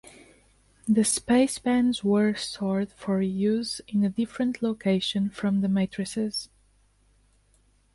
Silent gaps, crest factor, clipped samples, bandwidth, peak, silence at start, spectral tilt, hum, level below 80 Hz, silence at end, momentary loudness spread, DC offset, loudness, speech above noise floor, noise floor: none; 16 dB; under 0.1%; 11.5 kHz; -12 dBFS; 0.05 s; -5 dB/octave; 50 Hz at -60 dBFS; -60 dBFS; 1.5 s; 7 LU; under 0.1%; -26 LUFS; 38 dB; -63 dBFS